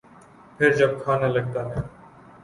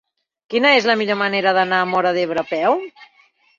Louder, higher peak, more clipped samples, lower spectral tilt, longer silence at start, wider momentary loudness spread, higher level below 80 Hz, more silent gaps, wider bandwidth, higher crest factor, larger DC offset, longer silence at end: second, -23 LUFS vs -17 LUFS; about the same, -4 dBFS vs -2 dBFS; neither; first, -7 dB/octave vs -4.5 dB/octave; about the same, 0.6 s vs 0.5 s; first, 13 LU vs 8 LU; first, -50 dBFS vs -66 dBFS; neither; first, 11.5 kHz vs 7.4 kHz; about the same, 20 dB vs 16 dB; neither; about the same, 0.55 s vs 0.55 s